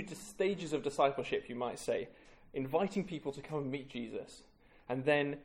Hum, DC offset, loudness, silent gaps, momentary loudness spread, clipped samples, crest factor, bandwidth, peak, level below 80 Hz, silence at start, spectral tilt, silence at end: none; under 0.1%; -37 LUFS; none; 14 LU; under 0.1%; 20 dB; 16.5 kHz; -16 dBFS; -66 dBFS; 0 s; -5.5 dB/octave; 0 s